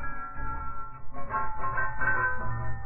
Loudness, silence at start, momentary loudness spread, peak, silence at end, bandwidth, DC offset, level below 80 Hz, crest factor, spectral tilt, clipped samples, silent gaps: -32 LUFS; 0 s; 14 LU; -14 dBFS; 0 s; 2.8 kHz; under 0.1%; -40 dBFS; 12 dB; -11 dB/octave; under 0.1%; none